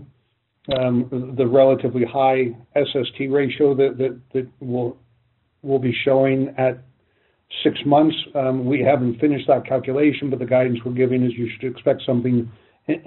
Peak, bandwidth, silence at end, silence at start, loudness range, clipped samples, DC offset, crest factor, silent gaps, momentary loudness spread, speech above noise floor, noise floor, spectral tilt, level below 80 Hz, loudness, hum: -4 dBFS; 4.2 kHz; 0.05 s; 0 s; 3 LU; under 0.1%; under 0.1%; 16 dB; none; 10 LU; 48 dB; -67 dBFS; -5.5 dB/octave; -60 dBFS; -20 LUFS; none